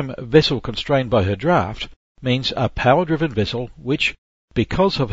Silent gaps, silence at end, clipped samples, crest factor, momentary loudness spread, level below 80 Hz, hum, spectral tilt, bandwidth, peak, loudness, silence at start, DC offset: 1.96-2.15 s, 4.18-4.48 s; 0 s; under 0.1%; 20 dB; 11 LU; -40 dBFS; none; -6.5 dB/octave; 8 kHz; 0 dBFS; -20 LUFS; 0 s; under 0.1%